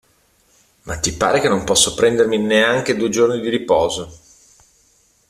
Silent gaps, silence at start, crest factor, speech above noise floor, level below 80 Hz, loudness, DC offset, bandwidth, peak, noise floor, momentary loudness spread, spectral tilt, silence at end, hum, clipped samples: none; 0.85 s; 18 dB; 41 dB; -44 dBFS; -16 LUFS; under 0.1%; 14.5 kHz; 0 dBFS; -58 dBFS; 8 LU; -3 dB/octave; 1.15 s; none; under 0.1%